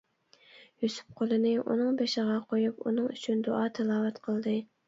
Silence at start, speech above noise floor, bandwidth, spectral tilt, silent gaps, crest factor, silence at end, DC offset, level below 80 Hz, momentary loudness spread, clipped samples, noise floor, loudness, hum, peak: 0.55 s; 33 dB; 7.8 kHz; -6 dB/octave; none; 14 dB; 0.25 s; under 0.1%; -78 dBFS; 6 LU; under 0.1%; -62 dBFS; -30 LUFS; none; -16 dBFS